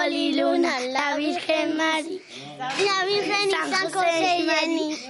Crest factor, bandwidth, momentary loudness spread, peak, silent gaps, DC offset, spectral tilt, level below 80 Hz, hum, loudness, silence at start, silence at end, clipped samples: 14 dB; 11.5 kHz; 7 LU; -10 dBFS; none; under 0.1%; -2.5 dB/octave; -74 dBFS; none; -23 LUFS; 0 s; 0 s; under 0.1%